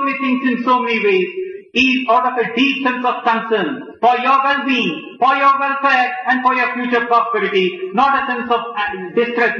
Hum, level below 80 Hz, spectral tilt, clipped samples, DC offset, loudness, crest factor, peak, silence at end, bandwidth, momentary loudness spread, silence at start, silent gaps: none; -60 dBFS; -5 dB/octave; under 0.1%; under 0.1%; -16 LUFS; 14 dB; -2 dBFS; 0 s; 7 kHz; 6 LU; 0 s; none